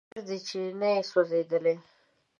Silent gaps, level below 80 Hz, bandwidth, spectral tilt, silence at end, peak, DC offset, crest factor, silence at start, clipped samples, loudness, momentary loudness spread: none; -84 dBFS; 7.4 kHz; -5 dB/octave; 0.6 s; -12 dBFS; under 0.1%; 18 dB; 0.15 s; under 0.1%; -29 LUFS; 10 LU